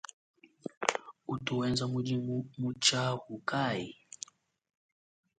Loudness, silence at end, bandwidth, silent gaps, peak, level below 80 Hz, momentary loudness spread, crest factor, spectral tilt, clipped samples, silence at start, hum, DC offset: -33 LUFS; 1.45 s; 9.4 kHz; 0.77-0.81 s; -4 dBFS; -68 dBFS; 18 LU; 30 dB; -4 dB/octave; under 0.1%; 0.65 s; none; under 0.1%